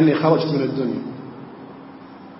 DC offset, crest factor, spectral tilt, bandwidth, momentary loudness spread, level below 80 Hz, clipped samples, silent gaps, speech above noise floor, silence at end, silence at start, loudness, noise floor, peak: under 0.1%; 18 dB; -11.5 dB/octave; 5.8 kHz; 22 LU; -66 dBFS; under 0.1%; none; 21 dB; 0 s; 0 s; -20 LUFS; -40 dBFS; -4 dBFS